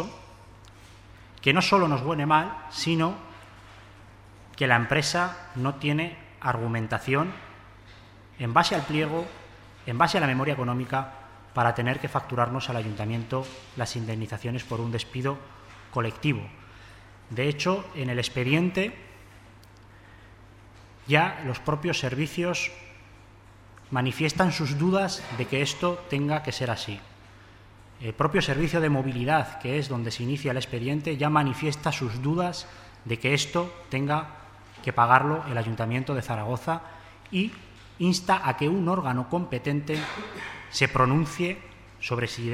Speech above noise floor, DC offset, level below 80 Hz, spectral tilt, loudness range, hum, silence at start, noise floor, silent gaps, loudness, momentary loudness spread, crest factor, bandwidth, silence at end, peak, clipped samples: 25 dB; under 0.1%; -54 dBFS; -5.5 dB/octave; 4 LU; none; 0 s; -51 dBFS; none; -27 LUFS; 14 LU; 24 dB; 15 kHz; 0 s; -2 dBFS; under 0.1%